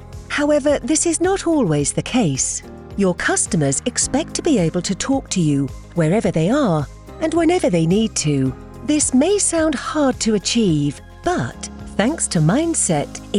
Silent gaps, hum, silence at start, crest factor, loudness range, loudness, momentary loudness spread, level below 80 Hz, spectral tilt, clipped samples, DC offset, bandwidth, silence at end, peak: none; none; 0 s; 16 dB; 2 LU; -18 LUFS; 7 LU; -40 dBFS; -4.5 dB/octave; under 0.1%; under 0.1%; 12 kHz; 0 s; -2 dBFS